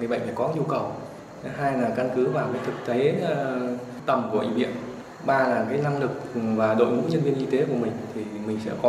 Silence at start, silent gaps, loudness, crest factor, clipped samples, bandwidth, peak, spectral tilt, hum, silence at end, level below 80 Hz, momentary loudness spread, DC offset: 0 s; none; -25 LUFS; 18 dB; under 0.1%; 13.5 kHz; -8 dBFS; -7.5 dB/octave; none; 0 s; -62 dBFS; 10 LU; under 0.1%